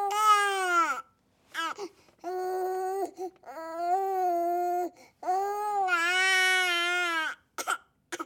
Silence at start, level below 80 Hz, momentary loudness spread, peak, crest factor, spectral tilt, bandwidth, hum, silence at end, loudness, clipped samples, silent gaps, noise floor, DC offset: 0 s; -80 dBFS; 17 LU; -12 dBFS; 18 dB; 0 dB/octave; 18.5 kHz; none; 0 s; -28 LUFS; under 0.1%; none; -65 dBFS; under 0.1%